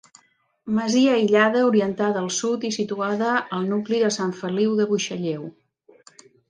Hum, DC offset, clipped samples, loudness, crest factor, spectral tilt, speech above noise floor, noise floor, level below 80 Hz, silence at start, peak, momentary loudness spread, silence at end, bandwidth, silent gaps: none; under 0.1%; under 0.1%; -22 LUFS; 18 dB; -4.5 dB/octave; 41 dB; -62 dBFS; -68 dBFS; 0.65 s; -4 dBFS; 9 LU; 1 s; 10 kHz; none